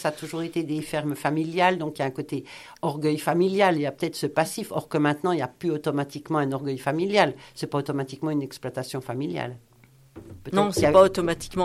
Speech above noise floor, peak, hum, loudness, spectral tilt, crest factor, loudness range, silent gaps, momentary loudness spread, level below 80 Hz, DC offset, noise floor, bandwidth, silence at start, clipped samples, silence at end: 29 dB; -4 dBFS; none; -25 LUFS; -5.5 dB/octave; 20 dB; 4 LU; none; 12 LU; -56 dBFS; under 0.1%; -54 dBFS; 14.5 kHz; 0 s; under 0.1%; 0 s